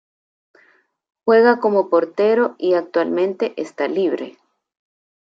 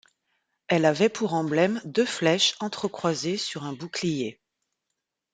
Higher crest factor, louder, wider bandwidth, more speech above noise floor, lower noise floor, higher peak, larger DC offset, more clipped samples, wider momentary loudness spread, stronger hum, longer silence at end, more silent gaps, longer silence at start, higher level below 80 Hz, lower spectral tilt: about the same, 18 dB vs 20 dB; first, -18 LUFS vs -25 LUFS; second, 7.6 kHz vs 9.6 kHz; second, 41 dB vs 58 dB; second, -58 dBFS vs -83 dBFS; first, -2 dBFS vs -6 dBFS; neither; neither; about the same, 11 LU vs 10 LU; neither; about the same, 1.05 s vs 1 s; neither; first, 1.25 s vs 0.7 s; second, -76 dBFS vs -70 dBFS; first, -6.5 dB/octave vs -4 dB/octave